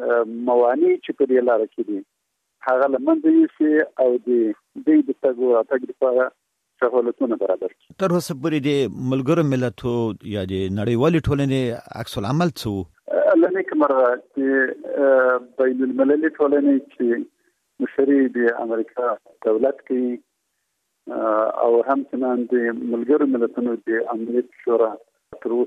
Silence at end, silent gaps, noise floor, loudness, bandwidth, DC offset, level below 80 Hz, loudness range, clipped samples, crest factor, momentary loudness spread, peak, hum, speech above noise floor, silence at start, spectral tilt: 0 s; none; -74 dBFS; -20 LUFS; 14 kHz; under 0.1%; -52 dBFS; 3 LU; under 0.1%; 14 dB; 9 LU; -6 dBFS; none; 54 dB; 0 s; -7.5 dB/octave